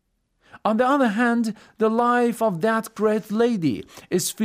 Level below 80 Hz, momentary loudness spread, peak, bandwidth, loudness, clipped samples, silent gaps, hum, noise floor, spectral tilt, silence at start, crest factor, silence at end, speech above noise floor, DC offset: -66 dBFS; 7 LU; -6 dBFS; 16 kHz; -22 LUFS; under 0.1%; none; none; -63 dBFS; -5 dB/octave; 0.55 s; 16 dB; 0 s; 42 dB; under 0.1%